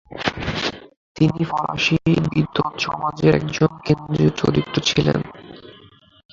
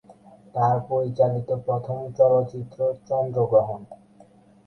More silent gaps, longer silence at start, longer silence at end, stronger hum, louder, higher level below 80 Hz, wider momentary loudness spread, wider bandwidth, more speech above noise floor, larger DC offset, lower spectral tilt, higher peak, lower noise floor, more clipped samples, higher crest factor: first, 0.97-1.15 s vs none; about the same, 0.1 s vs 0.1 s; about the same, 0.6 s vs 0.7 s; neither; first, -20 LUFS vs -23 LUFS; first, -44 dBFS vs -60 dBFS; second, 8 LU vs 12 LU; first, 7.4 kHz vs 6.2 kHz; about the same, 30 dB vs 30 dB; neither; second, -6 dB/octave vs -10 dB/octave; first, -2 dBFS vs -6 dBFS; second, -49 dBFS vs -53 dBFS; neither; about the same, 18 dB vs 18 dB